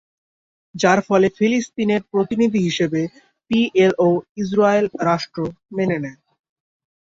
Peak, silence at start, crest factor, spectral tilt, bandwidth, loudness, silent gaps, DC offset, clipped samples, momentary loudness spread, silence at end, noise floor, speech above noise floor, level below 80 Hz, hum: -2 dBFS; 0.75 s; 16 dB; -6 dB/octave; 7.8 kHz; -19 LUFS; 4.29-4.35 s; under 0.1%; under 0.1%; 11 LU; 0.9 s; under -90 dBFS; over 72 dB; -58 dBFS; none